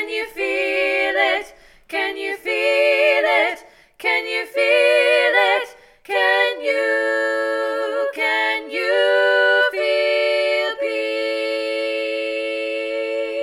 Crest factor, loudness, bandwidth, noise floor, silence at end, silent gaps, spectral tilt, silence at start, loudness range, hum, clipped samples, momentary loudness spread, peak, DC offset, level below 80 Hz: 16 dB; -18 LUFS; 15.5 kHz; -44 dBFS; 0 s; none; -0.5 dB/octave; 0 s; 3 LU; none; under 0.1%; 9 LU; -4 dBFS; under 0.1%; -62 dBFS